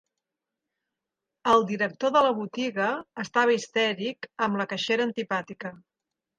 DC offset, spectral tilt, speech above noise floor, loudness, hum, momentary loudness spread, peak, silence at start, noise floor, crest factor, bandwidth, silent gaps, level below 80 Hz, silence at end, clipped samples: under 0.1%; -4.5 dB/octave; 61 dB; -26 LUFS; none; 10 LU; -8 dBFS; 1.45 s; -87 dBFS; 20 dB; 9.8 kHz; none; -70 dBFS; 0.6 s; under 0.1%